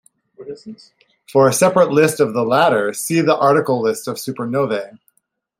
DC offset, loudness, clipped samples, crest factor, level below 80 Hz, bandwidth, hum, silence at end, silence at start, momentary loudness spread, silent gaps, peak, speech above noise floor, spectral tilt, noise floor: under 0.1%; -16 LUFS; under 0.1%; 16 dB; -64 dBFS; 16 kHz; none; 0.65 s; 0.4 s; 18 LU; none; -2 dBFS; 51 dB; -5 dB/octave; -67 dBFS